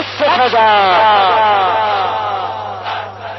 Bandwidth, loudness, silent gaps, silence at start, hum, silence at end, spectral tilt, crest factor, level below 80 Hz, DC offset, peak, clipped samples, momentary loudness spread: 6.2 kHz; -12 LUFS; none; 0 s; none; 0 s; -4.5 dB/octave; 10 dB; -56 dBFS; under 0.1%; -2 dBFS; under 0.1%; 13 LU